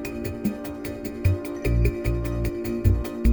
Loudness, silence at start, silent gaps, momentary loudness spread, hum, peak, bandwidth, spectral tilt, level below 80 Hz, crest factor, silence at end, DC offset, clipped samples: -26 LUFS; 0 s; none; 9 LU; none; -8 dBFS; over 20 kHz; -7.5 dB/octave; -30 dBFS; 16 dB; 0 s; under 0.1%; under 0.1%